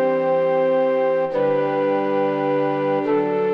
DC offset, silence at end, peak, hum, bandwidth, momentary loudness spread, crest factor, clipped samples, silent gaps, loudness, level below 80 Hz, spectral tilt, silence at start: under 0.1%; 0 s; -10 dBFS; none; 5.4 kHz; 2 LU; 10 dB; under 0.1%; none; -20 LUFS; -68 dBFS; -8.5 dB/octave; 0 s